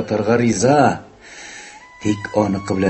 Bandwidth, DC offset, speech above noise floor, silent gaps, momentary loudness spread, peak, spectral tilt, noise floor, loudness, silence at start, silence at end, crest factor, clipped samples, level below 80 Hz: 8.6 kHz; under 0.1%; 22 dB; none; 22 LU; -2 dBFS; -5.5 dB/octave; -39 dBFS; -17 LUFS; 0 s; 0 s; 16 dB; under 0.1%; -46 dBFS